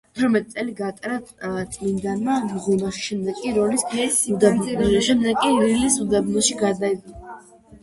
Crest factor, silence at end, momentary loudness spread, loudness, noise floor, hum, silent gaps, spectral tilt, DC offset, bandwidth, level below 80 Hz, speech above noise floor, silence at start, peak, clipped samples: 18 dB; 0.05 s; 11 LU; -21 LUFS; -44 dBFS; none; none; -4 dB/octave; under 0.1%; 12 kHz; -48 dBFS; 23 dB; 0.15 s; -2 dBFS; under 0.1%